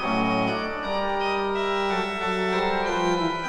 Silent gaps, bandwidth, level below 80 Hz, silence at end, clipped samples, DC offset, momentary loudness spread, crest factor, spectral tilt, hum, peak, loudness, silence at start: none; 11.5 kHz; -48 dBFS; 0 s; under 0.1%; under 0.1%; 3 LU; 14 dB; -5 dB/octave; none; -12 dBFS; -25 LUFS; 0 s